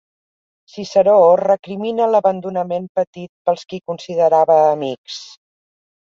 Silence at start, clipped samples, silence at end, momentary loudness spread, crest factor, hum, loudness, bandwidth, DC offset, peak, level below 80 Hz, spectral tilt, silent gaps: 0.75 s; under 0.1%; 0.75 s; 16 LU; 16 dB; none; -16 LUFS; 7.6 kHz; under 0.1%; -2 dBFS; -66 dBFS; -6 dB/octave; 2.89-2.95 s, 3.07-3.13 s, 3.29-3.45 s, 4.98-5.04 s